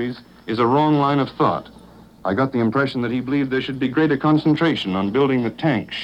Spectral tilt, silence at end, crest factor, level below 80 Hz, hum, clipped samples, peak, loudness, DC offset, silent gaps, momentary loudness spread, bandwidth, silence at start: -8 dB/octave; 0 s; 16 dB; -54 dBFS; none; under 0.1%; -4 dBFS; -20 LUFS; under 0.1%; none; 7 LU; 8.4 kHz; 0 s